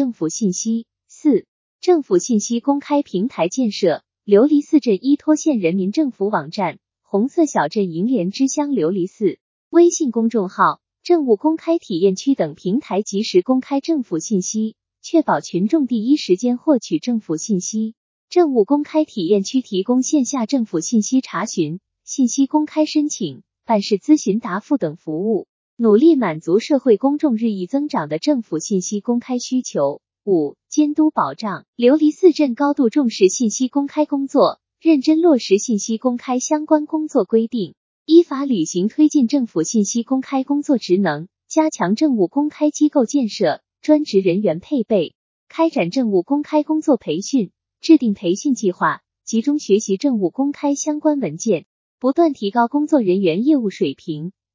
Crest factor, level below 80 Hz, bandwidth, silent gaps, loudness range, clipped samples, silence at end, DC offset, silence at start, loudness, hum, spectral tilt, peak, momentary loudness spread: 16 dB; -74 dBFS; 7.6 kHz; 1.48-1.79 s, 9.41-9.71 s, 17.97-18.28 s, 25.49-25.77 s, 31.68-31.73 s, 37.77-38.06 s, 45.15-45.47 s, 51.66-51.98 s; 3 LU; under 0.1%; 0.25 s; under 0.1%; 0 s; -18 LUFS; none; -5 dB/octave; 0 dBFS; 8 LU